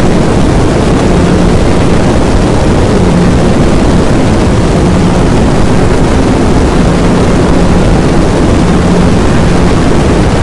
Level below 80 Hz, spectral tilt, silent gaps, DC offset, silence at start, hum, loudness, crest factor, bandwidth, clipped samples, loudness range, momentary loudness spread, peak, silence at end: -14 dBFS; -6.5 dB/octave; none; 10%; 0 s; none; -8 LUFS; 6 dB; 11.5 kHz; 0.8%; 0 LU; 1 LU; 0 dBFS; 0 s